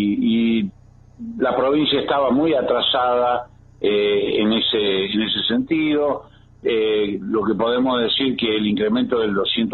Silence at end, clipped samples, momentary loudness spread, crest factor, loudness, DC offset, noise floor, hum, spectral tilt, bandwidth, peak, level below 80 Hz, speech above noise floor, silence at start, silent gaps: 0 s; under 0.1%; 6 LU; 12 dB; -19 LUFS; under 0.1%; -47 dBFS; none; -8 dB/octave; 4.3 kHz; -6 dBFS; -52 dBFS; 28 dB; 0 s; none